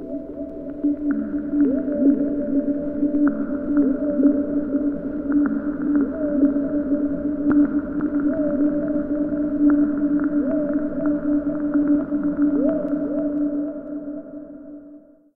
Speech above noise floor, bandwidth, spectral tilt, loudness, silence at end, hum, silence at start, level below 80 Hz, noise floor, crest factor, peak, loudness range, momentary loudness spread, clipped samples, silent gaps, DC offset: 25 dB; 2.1 kHz; -12 dB/octave; -22 LUFS; 0.35 s; none; 0 s; -46 dBFS; -46 dBFS; 16 dB; -6 dBFS; 2 LU; 12 LU; under 0.1%; none; under 0.1%